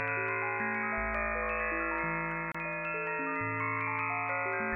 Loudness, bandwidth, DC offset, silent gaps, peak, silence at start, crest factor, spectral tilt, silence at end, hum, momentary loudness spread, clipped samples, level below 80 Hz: -32 LUFS; 7.4 kHz; under 0.1%; none; -20 dBFS; 0 s; 14 dB; -9 dB/octave; 0 s; none; 2 LU; under 0.1%; -52 dBFS